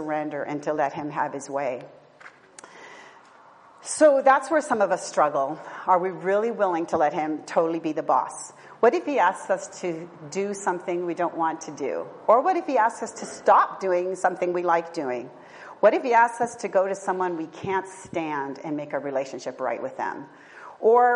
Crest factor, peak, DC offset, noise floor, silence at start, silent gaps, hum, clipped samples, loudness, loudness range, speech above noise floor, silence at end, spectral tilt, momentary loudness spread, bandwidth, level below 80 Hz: 20 dB; -6 dBFS; under 0.1%; -51 dBFS; 0 s; none; none; under 0.1%; -24 LUFS; 7 LU; 27 dB; 0 s; -4.5 dB/octave; 14 LU; 10.5 kHz; -74 dBFS